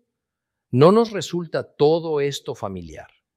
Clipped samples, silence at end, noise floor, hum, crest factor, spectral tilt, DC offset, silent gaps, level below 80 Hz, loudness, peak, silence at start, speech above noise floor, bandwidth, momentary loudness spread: under 0.1%; 0.35 s; -83 dBFS; none; 20 dB; -6.5 dB/octave; under 0.1%; none; -58 dBFS; -20 LUFS; -2 dBFS; 0.7 s; 63 dB; 13.5 kHz; 16 LU